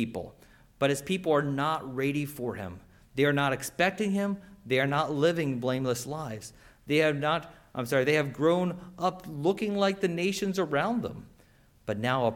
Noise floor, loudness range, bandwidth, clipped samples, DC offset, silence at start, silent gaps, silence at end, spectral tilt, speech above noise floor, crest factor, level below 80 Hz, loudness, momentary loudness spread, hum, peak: -60 dBFS; 2 LU; 18 kHz; under 0.1%; under 0.1%; 0 s; none; 0 s; -5.5 dB/octave; 32 dB; 18 dB; -60 dBFS; -29 LUFS; 13 LU; none; -12 dBFS